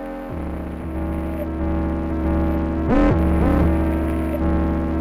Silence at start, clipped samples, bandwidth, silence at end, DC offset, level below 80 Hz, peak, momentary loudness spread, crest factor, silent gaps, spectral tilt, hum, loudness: 0 s; under 0.1%; 12.5 kHz; 0 s; under 0.1%; -24 dBFS; -6 dBFS; 11 LU; 14 dB; none; -9.5 dB/octave; none; -21 LUFS